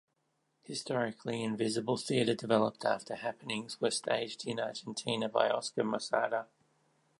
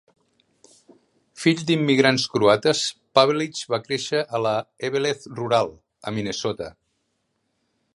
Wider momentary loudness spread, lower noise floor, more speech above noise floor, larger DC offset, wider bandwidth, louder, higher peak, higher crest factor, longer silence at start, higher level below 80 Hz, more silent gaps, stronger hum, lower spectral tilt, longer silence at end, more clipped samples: second, 8 LU vs 11 LU; first, -79 dBFS vs -73 dBFS; second, 45 dB vs 51 dB; neither; about the same, 11.5 kHz vs 11.5 kHz; second, -34 LUFS vs -22 LUFS; second, -12 dBFS vs 0 dBFS; about the same, 22 dB vs 22 dB; second, 0.7 s vs 1.35 s; second, -80 dBFS vs -62 dBFS; neither; neither; about the same, -4 dB/octave vs -4.5 dB/octave; second, 0.75 s vs 1.25 s; neither